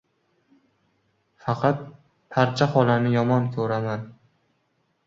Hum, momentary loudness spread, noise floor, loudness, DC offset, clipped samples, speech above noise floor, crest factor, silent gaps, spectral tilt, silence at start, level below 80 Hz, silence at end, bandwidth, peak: none; 14 LU; -70 dBFS; -23 LUFS; under 0.1%; under 0.1%; 48 dB; 20 dB; none; -7.5 dB/octave; 1.45 s; -62 dBFS; 0.95 s; 7.6 kHz; -4 dBFS